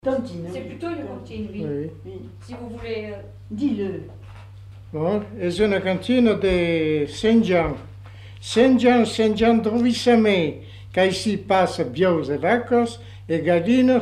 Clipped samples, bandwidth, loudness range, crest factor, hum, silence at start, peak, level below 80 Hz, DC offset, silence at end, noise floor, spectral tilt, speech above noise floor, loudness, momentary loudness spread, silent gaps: under 0.1%; 11.5 kHz; 11 LU; 16 dB; 50 Hz at -55 dBFS; 0.05 s; -6 dBFS; -46 dBFS; under 0.1%; 0 s; -41 dBFS; -6 dB/octave; 20 dB; -21 LUFS; 19 LU; none